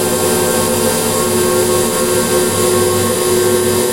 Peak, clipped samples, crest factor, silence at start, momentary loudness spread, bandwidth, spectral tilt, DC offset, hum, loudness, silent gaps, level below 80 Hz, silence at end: 0 dBFS; under 0.1%; 12 dB; 0 s; 1 LU; 16 kHz; -3.5 dB/octave; 0.8%; none; -13 LUFS; none; -42 dBFS; 0 s